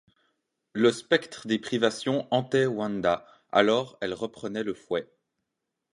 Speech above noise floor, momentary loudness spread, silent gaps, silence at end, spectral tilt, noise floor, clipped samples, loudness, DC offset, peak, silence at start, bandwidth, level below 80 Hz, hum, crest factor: 57 dB; 10 LU; none; 0.9 s; -5 dB/octave; -83 dBFS; under 0.1%; -27 LUFS; under 0.1%; -6 dBFS; 0.75 s; 11.5 kHz; -66 dBFS; none; 22 dB